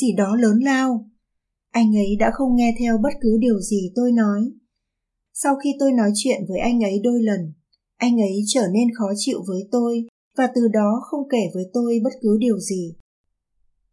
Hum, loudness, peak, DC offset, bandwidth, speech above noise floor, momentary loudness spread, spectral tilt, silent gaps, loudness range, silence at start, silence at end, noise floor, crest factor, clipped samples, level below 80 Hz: none; -20 LUFS; -6 dBFS; under 0.1%; 12 kHz; 60 dB; 7 LU; -5.5 dB/octave; 10.09-10.31 s; 2 LU; 0 s; 1 s; -79 dBFS; 14 dB; under 0.1%; -46 dBFS